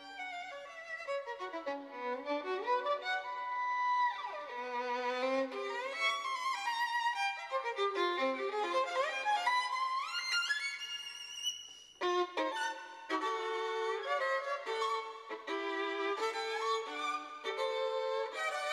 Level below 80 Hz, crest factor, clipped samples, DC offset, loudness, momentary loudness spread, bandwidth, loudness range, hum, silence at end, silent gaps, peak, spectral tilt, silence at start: -86 dBFS; 16 dB; under 0.1%; under 0.1%; -36 LUFS; 8 LU; 15 kHz; 3 LU; none; 0 s; none; -20 dBFS; 0 dB/octave; 0 s